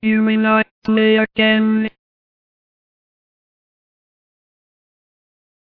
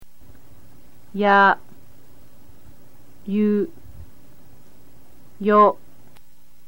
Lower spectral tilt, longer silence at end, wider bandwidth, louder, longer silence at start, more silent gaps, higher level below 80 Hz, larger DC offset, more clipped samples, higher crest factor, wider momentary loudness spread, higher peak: first, -8.5 dB/octave vs -7 dB/octave; first, 3.9 s vs 0.95 s; second, 4.9 kHz vs 17 kHz; first, -15 LUFS vs -18 LUFS; about the same, 0 s vs 0 s; first, 0.71-0.82 s vs none; about the same, -58 dBFS vs -56 dBFS; second, under 0.1% vs 2%; neither; about the same, 18 dB vs 20 dB; second, 5 LU vs 19 LU; about the same, -2 dBFS vs -4 dBFS